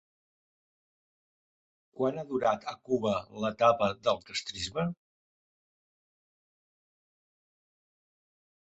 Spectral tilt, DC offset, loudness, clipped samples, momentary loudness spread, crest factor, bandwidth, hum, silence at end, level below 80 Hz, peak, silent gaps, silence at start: -5 dB/octave; under 0.1%; -31 LUFS; under 0.1%; 10 LU; 24 dB; 8.2 kHz; none; 3.7 s; -66 dBFS; -12 dBFS; none; 1.95 s